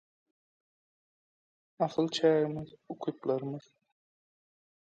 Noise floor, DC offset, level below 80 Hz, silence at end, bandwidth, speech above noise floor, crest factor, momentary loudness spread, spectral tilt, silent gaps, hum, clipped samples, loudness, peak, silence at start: under -90 dBFS; under 0.1%; -74 dBFS; 1.35 s; 9 kHz; over 59 dB; 22 dB; 15 LU; -6 dB/octave; none; none; under 0.1%; -31 LUFS; -14 dBFS; 1.8 s